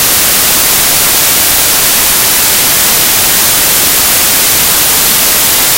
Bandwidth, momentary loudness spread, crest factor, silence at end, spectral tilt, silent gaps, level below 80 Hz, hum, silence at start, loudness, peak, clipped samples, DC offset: over 20 kHz; 0 LU; 8 dB; 0 s; 0 dB/octave; none; -32 dBFS; none; 0 s; -5 LUFS; 0 dBFS; 0.9%; under 0.1%